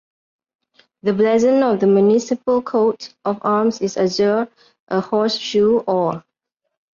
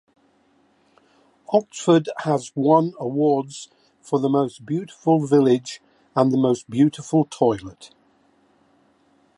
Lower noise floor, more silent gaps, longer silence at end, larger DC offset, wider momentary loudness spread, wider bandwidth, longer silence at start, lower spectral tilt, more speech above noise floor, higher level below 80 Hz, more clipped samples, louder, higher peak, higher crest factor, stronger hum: first, -77 dBFS vs -61 dBFS; first, 4.80-4.87 s vs none; second, 0.75 s vs 1.5 s; neither; about the same, 9 LU vs 11 LU; second, 7.4 kHz vs 11 kHz; second, 1.05 s vs 1.5 s; second, -5.5 dB/octave vs -7 dB/octave; first, 60 dB vs 41 dB; about the same, -62 dBFS vs -64 dBFS; neither; first, -18 LUFS vs -21 LUFS; about the same, -6 dBFS vs -4 dBFS; second, 12 dB vs 18 dB; neither